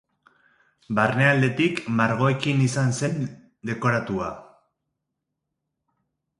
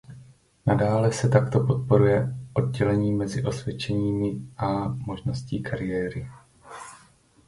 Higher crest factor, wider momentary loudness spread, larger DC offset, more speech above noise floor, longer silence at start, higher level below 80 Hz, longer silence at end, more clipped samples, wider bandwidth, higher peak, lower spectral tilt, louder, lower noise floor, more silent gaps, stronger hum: about the same, 20 dB vs 22 dB; about the same, 14 LU vs 15 LU; neither; first, 59 dB vs 33 dB; first, 0.9 s vs 0.1 s; second, -60 dBFS vs -48 dBFS; first, 1.95 s vs 0.5 s; neither; about the same, 11.5 kHz vs 11.5 kHz; about the same, -4 dBFS vs -4 dBFS; second, -6 dB/octave vs -7.5 dB/octave; about the same, -23 LUFS vs -25 LUFS; first, -81 dBFS vs -57 dBFS; neither; neither